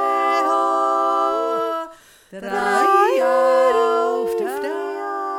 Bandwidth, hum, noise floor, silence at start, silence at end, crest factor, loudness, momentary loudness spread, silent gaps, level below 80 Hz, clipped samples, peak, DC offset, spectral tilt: 17 kHz; none; -43 dBFS; 0 s; 0 s; 14 dB; -19 LUFS; 10 LU; none; -64 dBFS; under 0.1%; -4 dBFS; under 0.1%; -3.5 dB/octave